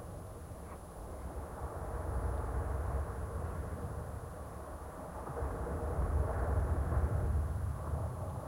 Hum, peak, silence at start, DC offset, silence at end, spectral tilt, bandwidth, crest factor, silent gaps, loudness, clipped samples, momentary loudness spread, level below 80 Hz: none; -20 dBFS; 0 s; under 0.1%; 0 s; -8 dB/octave; 16.5 kHz; 16 dB; none; -39 LUFS; under 0.1%; 13 LU; -40 dBFS